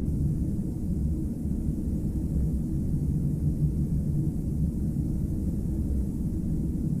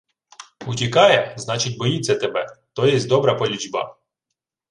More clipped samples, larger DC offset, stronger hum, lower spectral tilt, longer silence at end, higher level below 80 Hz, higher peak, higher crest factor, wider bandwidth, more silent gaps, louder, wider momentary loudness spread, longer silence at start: neither; neither; neither; first, -10 dB/octave vs -4.5 dB/octave; second, 0 s vs 0.8 s; first, -32 dBFS vs -60 dBFS; second, -14 dBFS vs -2 dBFS; second, 14 dB vs 20 dB; first, 15 kHz vs 11.5 kHz; neither; second, -29 LUFS vs -19 LUFS; second, 3 LU vs 13 LU; second, 0 s vs 0.4 s